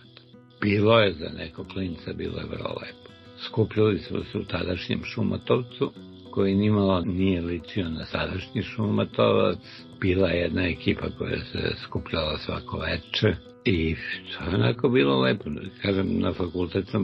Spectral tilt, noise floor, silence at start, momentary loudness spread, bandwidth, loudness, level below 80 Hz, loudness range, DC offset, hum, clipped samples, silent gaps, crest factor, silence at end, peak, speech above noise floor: -8 dB/octave; -51 dBFS; 0.35 s; 11 LU; 6 kHz; -26 LUFS; -50 dBFS; 3 LU; under 0.1%; none; under 0.1%; none; 20 dB; 0 s; -4 dBFS; 25 dB